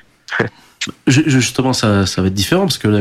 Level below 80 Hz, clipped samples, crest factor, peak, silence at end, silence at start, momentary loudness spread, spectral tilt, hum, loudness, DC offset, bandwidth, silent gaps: -44 dBFS; under 0.1%; 14 dB; -2 dBFS; 0 s; 0.3 s; 10 LU; -5 dB/octave; none; -15 LUFS; under 0.1%; 16 kHz; none